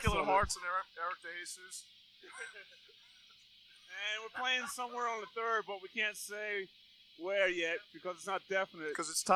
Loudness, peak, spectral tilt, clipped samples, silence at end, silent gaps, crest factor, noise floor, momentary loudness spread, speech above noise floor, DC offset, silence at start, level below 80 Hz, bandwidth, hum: -37 LUFS; -16 dBFS; -2.5 dB/octave; under 0.1%; 0 s; none; 22 dB; -62 dBFS; 16 LU; 25 dB; under 0.1%; 0 s; -56 dBFS; 15 kHz; none